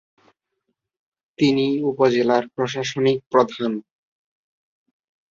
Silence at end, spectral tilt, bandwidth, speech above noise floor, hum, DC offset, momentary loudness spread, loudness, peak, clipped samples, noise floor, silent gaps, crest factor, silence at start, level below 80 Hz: 1.5 s; -6 dB/octave; 7.6 kHz; 57 dB; none; under 0.1%; 8 LU; -20 LUFS; -4 dBFS; under 0.1%; -76 dBFS; 3.26-3.31 s; 20 dB; 1.4 s; -64 dBFS